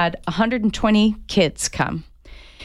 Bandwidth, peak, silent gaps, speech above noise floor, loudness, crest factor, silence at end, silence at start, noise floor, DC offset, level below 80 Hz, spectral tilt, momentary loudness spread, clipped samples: 14 kHz; -6 dBFS; none; 23 dB; -20 LUFS; 16 dB; 0 s; 0 s; -43 dBFS; under 0.1%; -38 dBFS; -4.5 dB/octave; 7 LU; under 0.1%